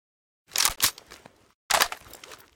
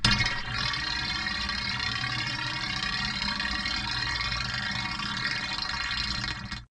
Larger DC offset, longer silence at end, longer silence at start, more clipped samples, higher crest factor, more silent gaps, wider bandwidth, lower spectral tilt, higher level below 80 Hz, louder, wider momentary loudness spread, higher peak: neither; first, 0.2 s vs 0.05 s; first, 0.55 s vs 0 s; neither; about the same, 26 dB vs 22 dB; first, 1.54-1.69 s vs none; first, 17 kHz vs 11 kHz; second, 1 dB/octave vs -2.5 dB/octave; second, -54 dBFS vs -42 dBFS; first, -24 LUFS vs -28 LUFS; first, 23 LU vs 2 LU; first, -4 dBFS vs -10 dBFS